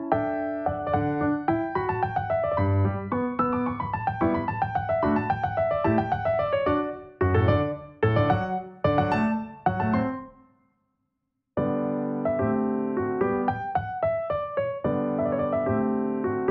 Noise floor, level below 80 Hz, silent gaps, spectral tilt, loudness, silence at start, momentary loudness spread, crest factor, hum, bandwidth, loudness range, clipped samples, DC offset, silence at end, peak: -79 dBFS; -50 dBFS; none; -10 dB/octave; -26 LUFS; 0 s; 5 LU; 16 dB; none; 5.8 kHz; 4 LU; under 0.1%; under 0.1%; 0 s; -10 dBFS